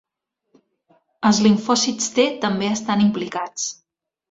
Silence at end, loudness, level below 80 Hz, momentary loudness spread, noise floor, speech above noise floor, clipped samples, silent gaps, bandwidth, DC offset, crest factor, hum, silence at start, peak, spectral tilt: 0.6 s; -20 LUFS; -62 dBFS; 10 LU; -77 dBFS; 58 dB; under 0.1%; none; 7.8 kHz; under 0.1%; 18 dB; none; 1.2 s; -4 dBFS; -4 dB/octave